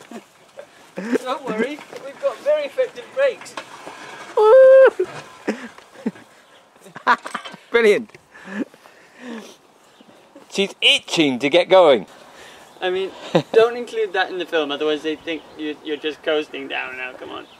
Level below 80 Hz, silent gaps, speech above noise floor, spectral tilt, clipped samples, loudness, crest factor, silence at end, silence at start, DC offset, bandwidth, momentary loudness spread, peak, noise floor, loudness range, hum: -68 dBFS; none; 31 dB; -4 dB/octave; under 0.1%; -18 LUFS; 18 dB; 0.15 s; 0.1 s; under 0.1%; 12.5 kHz; 22 LU; -2 dBFS; -51 dBFS; 8 LU; none